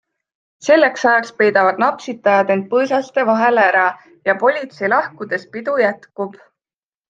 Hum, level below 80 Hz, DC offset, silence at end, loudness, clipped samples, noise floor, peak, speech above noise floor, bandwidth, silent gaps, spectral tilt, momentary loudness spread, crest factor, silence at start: none; -68 dBFS; under 0.1%; 0.75 s; -16 LUFS; under 0.1%; under -90 dBFS; 0 dBFS; over 74 dB; 7.8 kHz; none; -5 dB/octave; 11 LU; 16 dB; 0.65 s